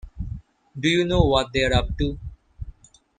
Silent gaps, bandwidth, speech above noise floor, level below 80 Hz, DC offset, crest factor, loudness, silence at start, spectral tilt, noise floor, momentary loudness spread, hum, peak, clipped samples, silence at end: none; 9.6 kHz; 25 dB; -32 dBFS; under 0.1%; 22 dB; -22 LUFS; 0.05 s; -5.5 dB/octave; -46 dBFS; 22 LU; none; -2 dBFS; under 0.1%; 0.5 s